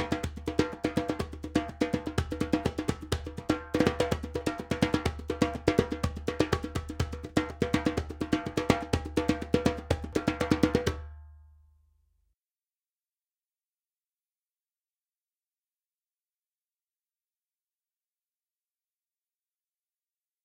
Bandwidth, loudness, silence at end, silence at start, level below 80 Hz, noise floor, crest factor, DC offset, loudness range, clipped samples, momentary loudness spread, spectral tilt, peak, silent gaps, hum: 17 kHz; -31 LUFS; 9 s; 0 s; -44 dBFS; under -90 dBFS; 28 dB; under 0.1%; 3 LU; under 0.1%; 7 LU; -6 dB/octave; -6 dBFS; none; none